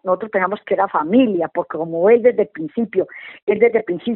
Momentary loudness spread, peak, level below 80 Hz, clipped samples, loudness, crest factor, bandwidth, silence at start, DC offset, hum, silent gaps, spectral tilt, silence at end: 10 LU; -2 dBFS; -62 dBFS; under 0.1%; -18 LUFS; 16 dB; 4.1 kHz; 0.05 s; under 0.1%; none; 3.42-3.47 s; -5 dB/octave; 0 s